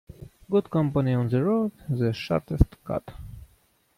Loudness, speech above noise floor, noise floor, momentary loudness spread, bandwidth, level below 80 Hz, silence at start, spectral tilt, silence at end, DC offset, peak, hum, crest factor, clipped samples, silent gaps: -26 LUFS; 39 dB; -64 dBFS; 10 LU; 15 kHz; -38 dBFS; 0.2 s; -9 dB/octave; 0.55 s; under 0.1%; -4 dBFS; none; 22 dB; under 0.1%; none